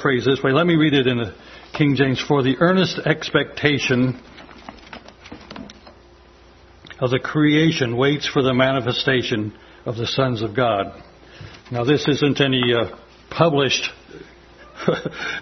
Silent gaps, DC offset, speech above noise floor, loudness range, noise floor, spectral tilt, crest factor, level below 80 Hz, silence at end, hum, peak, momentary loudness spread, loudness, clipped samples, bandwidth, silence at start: none; under 0.1%; 29 dB; 6 LU; -48 dBFS; -5.5 dB/octave; 20 dB; -52 dBFS; 0 s; none; 0 dBFS; 21 LU; -19 LUFS; under 0.1%; 6.4 kHz; 0 s